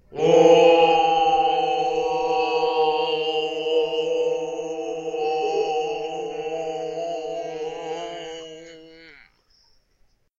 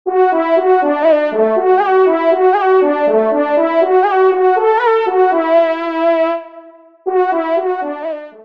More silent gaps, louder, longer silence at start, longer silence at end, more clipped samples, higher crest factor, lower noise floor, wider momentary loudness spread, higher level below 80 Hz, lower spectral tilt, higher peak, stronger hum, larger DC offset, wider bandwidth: neither; second, -21 LUFS vs -13 LUFS; about the same, 0.1 s vs 0.05 s; first, 1.3 s vs 0 s; neither; first, 18 dB vs 12 dB; first, -62 dBFS vs -39 dBFS; first, 16 LU vs 7 LU; first, -58 dBFS vs -68 dBFS; second, -4 dB/octave vs -6.5 dB/octave; about the same, -4 dBFS vs -2 dBFS; neither; second, under 0.1% vs 0.3%; first, 7.6 kHz vs 5.2 kHz